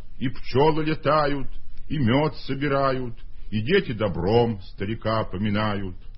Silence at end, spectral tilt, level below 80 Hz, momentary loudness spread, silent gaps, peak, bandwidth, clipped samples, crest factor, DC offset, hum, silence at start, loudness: 0 s; -10 dB/octave; -40 dBFS; 10 LU; none; -6 dBFS; 6 kHz; under 0.1%; 18 dB; under 0.1%; none; 0 s; -24 LUFS